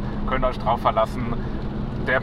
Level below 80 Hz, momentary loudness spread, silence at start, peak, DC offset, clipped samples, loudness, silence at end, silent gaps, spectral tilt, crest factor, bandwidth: -30 dBFS; 8 LU; 0 s; -6 dBFS; under 0.1%; under 0.1%; -24 LUFS; 0 s; none; -7.5 dB/octave; 18 dB; 12 kHz